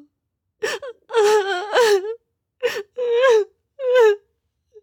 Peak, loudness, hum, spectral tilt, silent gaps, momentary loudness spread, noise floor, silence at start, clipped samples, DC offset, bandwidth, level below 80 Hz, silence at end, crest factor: -6 dBFS; -19 LUFS; none; -1 dB/octave; none; 14 LU; -77 dBFS; 0.6 s; under 0.1%; under 0.1%; 17.5 kHz; -76 dBFS; 0.65 s; 14 dB